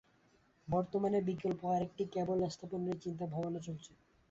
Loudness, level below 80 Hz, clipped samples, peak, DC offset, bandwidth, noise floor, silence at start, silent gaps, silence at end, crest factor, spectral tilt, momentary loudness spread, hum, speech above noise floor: -37 LUFS; -66 dBFS; under 0.1%; -22 dBFS; under 0.1%; 8 kHz; -70 dBFS; 0.65 s; none; 0.45 s; 16 dB; -7.5 dB/octave; 8 LU; none; 34 dB